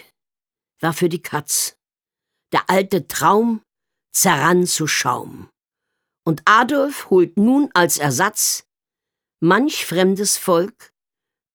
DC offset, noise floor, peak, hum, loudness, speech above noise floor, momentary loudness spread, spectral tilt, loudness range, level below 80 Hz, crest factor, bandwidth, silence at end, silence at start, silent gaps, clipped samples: under 0.1%; under -90 dBFS; -2 dBFS; none; -17 LUFS; over 73 dB; 10 LU; -3.5 dB/octave; 3 LU; -64 dBFS; 18 dB; over 20 kHz; 0.85 s; 0.8 s; none; under 0.1%